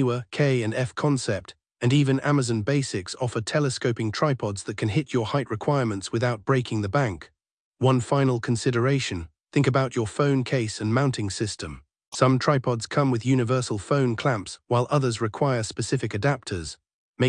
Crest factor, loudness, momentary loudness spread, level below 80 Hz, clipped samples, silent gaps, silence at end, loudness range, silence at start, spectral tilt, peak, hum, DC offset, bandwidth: 20 dB; -25 LUFS; 7 LU; -58 dBFS; under 0.1%; 7.51-7.72 s, 12.07-12.12 s, 16.94-17.14 s; 0 s; 2 LU; 0 s; -6 dB/octave; -6 dBFS; none; under 0.1%; 10.5 kHz